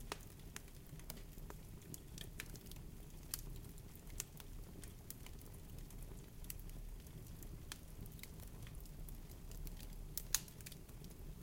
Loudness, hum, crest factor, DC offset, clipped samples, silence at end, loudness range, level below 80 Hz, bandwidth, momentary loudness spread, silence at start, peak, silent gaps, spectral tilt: -51 LUFS; none; 38 dB; under 0.1%; under 0.1%; 0 s; 6 LU; -54 dBFS; 17 kHz; 8 LU; 0 s; -12 dBFS; none; -3 dB/octave